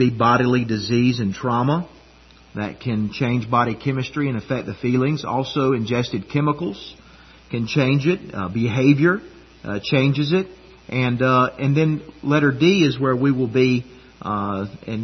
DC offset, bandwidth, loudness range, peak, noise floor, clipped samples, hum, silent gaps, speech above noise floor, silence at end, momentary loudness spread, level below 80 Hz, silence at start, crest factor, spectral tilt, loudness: under 0.1%; 6.4 kHz; 4 LU; -2 dBFS; -49 dBFS; under 0.1%; none; none; 29 dB; 0 s; 11 LU; -52 dBFS; 0 s; 18 dB; -7 dB/octave; -20 LUFS